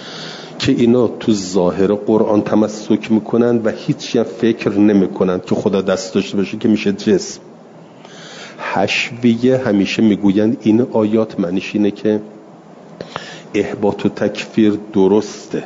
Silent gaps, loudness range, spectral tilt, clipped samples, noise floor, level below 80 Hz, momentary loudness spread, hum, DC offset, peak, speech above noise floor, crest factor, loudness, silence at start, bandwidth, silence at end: none; 4 LU; -6 dB/octave; under 0.1%; -39 dBFS; -56 dBFS; 14 LU; none; under 0.1%; -2 dBFS; 24 dB; 14 dB; -16 LUFS; 0 s; 7.8 kHz; 0 s